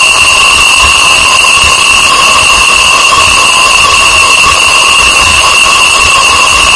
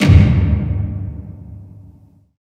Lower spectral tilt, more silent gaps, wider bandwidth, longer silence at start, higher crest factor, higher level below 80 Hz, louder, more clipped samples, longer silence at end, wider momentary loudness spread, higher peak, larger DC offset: second, 0.5 dB/octave vs -7.5 dB/octave; neither; first, 12 kHz vs 8.8 kHz; about the same, 0 s vs 0 s; second, 4 dB vs 16 dB; about the same, -26 dBFS vs -22 dBFS; first, -2 LUFS vs -15 LUFS; first, 10% vs 0.3%; second, 0 s vs 0.85 s; second, 1 LU vs 25 LU; about the same, 0 dBFS vs 0 dBFS; neither